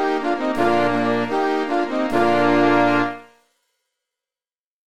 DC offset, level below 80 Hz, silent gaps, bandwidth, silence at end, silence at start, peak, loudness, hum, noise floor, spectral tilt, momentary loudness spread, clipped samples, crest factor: under 0.1%; -54 dBFS; 4.66-4.72 s; 12.5 kHz; 0.05 s; 0 s; -4 dBFS; -19 LUFS; none; under -90 dBFS; -6 dB/octave; 6 LU; under 0.1%; 16 dB